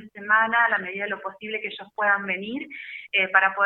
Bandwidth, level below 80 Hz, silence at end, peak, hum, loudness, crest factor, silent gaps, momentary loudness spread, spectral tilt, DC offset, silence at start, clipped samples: 4.3 kHz; -76 dBFS; 0 s; -4 dBFS; none; -23 LUFS; 22 dB; none; 14 LU; -6.5 dB/octave; under 0.1%; 0 s; under 0.1%